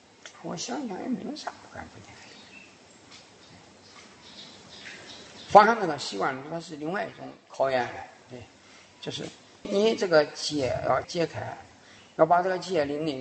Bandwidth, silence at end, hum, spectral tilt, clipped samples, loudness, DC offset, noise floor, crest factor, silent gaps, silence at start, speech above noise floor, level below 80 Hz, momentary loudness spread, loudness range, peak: 8.8 kHz; 0 s; none; -4.5 dB/octave; under 0.1%; -26 LUFS; under 0.1%; -53 dBFS; 26 dB; none; 0.25 s; 27 dB; -64 dBFS; 24 LU; 20 LU; -2 dBFS